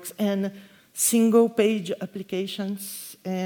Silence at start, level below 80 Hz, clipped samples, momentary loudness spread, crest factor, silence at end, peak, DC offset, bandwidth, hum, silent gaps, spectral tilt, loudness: 0 s; -74 dBFS; under 0.1%; 14 LU; 18 dB; 0 s; -8 dBFS; under 0.1%; over 20 kHz; none; none; -4.5 dB/octave; -24 LUFS